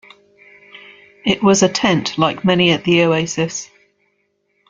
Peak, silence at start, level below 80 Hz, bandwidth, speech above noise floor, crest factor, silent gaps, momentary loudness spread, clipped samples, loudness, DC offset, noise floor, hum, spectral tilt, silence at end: -2 dBFS; 0.75 s; -54 dBFS; 9.4 kHz; 51 dB; 16 dB; none; 9 LU; under 0.1%; -15 LUFS; under 0.1%; -66 dBFS; none; -4.5 dB/octave; 1.05 s